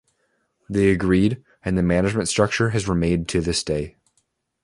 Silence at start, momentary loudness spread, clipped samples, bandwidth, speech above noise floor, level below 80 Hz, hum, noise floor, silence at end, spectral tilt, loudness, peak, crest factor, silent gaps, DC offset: 0.7 s; 8 LU; under 0.1%; 11.5 kHz; 50 dB; -40 dBFS; none; -70 dBFS; 0.75 s; -5.5 dB/octave; -21 LUFS; -2 dBFS; 20 dB; none; under 0.1%